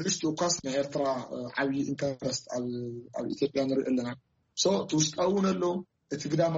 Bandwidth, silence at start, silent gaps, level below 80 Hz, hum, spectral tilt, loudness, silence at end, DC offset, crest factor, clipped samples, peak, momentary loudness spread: 8 kHz; 0 s; none; -66 dBFS; none; -4.5 dB/octave; -30 LUFS; 0 s; under 0.1%; 16 dB; under 0.1%; -14 dBFS; 11 LU